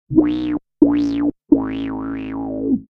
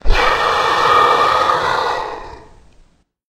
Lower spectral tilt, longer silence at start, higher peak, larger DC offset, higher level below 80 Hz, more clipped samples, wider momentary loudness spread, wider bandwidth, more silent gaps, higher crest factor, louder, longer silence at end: first, -8.5 dB/octave vs -3 dB/octave; about the same, 0.1 s vs 0.05 s; about the same, 0 dBFS vs 0 dBFS; neither; second, -44 dBFS vs -26 dBFS; neither; about the same, 10 LU vs 12 LU; second, 6 kHz vs 15 kHz; neither; about the same, 18 dB vs 16 dB; second, -20 LUFS vs -14 LUFS; second, 0.05 s vs 0.85 s